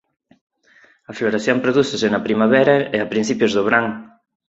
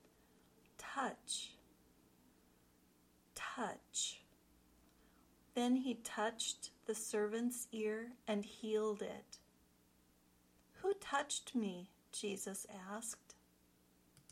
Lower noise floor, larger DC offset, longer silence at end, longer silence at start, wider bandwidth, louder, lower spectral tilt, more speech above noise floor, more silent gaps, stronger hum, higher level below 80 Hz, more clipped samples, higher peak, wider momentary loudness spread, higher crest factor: second, -53 dBFS vs -72 dBFS; neither; second, 0.45 s vs 1 s; first, 1.1 s vs 0.8 s; second, 8 kHz vs 16.5 kHz; first, -17 LUFS vs -42 LUFS; first, -5 dB/octave vs -3 dB/octave; first, 36 dB vs 30 dB; neither; second, none vs 60 Hz at -80 dBFS; first, -58 dBFS vs -80 dBFS; neither; first, -2 dBFS vs -22 dBFS; about the same, 9 LU vs 10 LU; second, 16 dB vs 22 dB